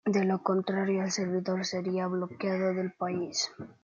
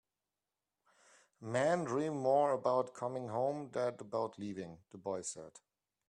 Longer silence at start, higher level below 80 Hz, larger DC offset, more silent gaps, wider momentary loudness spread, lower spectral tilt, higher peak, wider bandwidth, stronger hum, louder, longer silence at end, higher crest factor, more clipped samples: second, 0.05 s vs 1.4 s; about the same, -76 dBFS vs -80 dBFS; neither; neither; second, 5 LU vs 15 LU; about the same, -5 dB/octave vs -5.5 dB/octave; first, -12 dBFS vs -20 dBFS; second, 7.6 kHz vs 11 kHz; neither; first, -31 LUFS vs -36 LUFS; second, 0.1 s vs 0.5 s; about the same, 18 dB vs 18 dB; neither